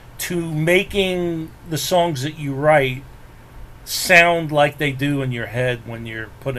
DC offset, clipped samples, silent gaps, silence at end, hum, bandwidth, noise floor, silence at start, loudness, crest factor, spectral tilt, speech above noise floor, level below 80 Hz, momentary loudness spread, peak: under 0.1%; under 0.1%; none; 0 s; none; 15.5 kHz; -40 dBFS; 0.05 s; -18 LUFS; 20 dB; -4.5 dB/octave; 21 dB; -44 dBFS; 16 LU; 0 dBFS